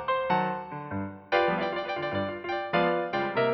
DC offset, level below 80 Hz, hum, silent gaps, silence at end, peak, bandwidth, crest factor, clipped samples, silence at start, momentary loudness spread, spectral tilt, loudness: under 0.1%; -64 dBFS; none; none; 0 s; -12 dBFS; 6 kHz; 16 dB; under 0.1%; 0 s; 10 LU; -7.5 dB/octave; -29 LUFS